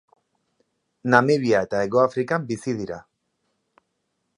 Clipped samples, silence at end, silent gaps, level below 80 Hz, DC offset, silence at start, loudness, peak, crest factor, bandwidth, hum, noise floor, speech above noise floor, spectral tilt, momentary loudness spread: under 0.1%; 1.4 s; none; -62 dBFS; under 0.1%; 1.05 s; -22 LUFS; 0 dBFS; 24 dB; 11 kHz; none; -75 dBFS; 54 dB; -6.5 dB/octave; 14 LU